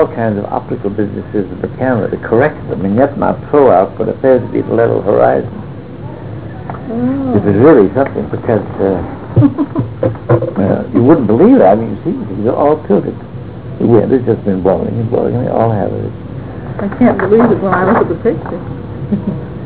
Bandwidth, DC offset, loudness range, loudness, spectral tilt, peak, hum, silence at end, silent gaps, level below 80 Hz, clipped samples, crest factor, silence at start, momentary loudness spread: 4 kHz; 1%; 3 LU; -12 LUFS; -12.5 dB/octave; 0 dBFS; none; 0 s; none; -36 dBFS; under 0.1%; 12 dB; 0 s; 16 LU